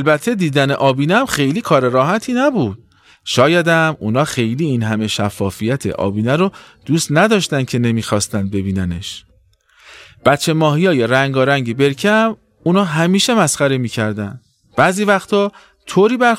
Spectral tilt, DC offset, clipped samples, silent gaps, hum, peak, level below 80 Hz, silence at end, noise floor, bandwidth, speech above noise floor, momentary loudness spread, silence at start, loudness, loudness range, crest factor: -5 dB/octave; under 0.1%; under 0.1%; none; none; 0 dBFS; -50 dBFS; 0 s; -54 dBFS; 16 kHz; 39 dB; 8 LU; 0 s; -15 LUFS; 3 LU; 14 dB